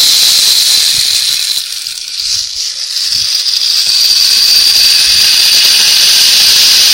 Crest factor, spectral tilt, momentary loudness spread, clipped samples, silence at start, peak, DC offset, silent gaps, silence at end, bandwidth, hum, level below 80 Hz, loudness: 8 dB; 3 dB/octave; 10 LU; 1%; 0 s; 0 dBFS; 0.2%; none; 0 s; over 20 kHz; none; -46 dBFS; -5 LUFS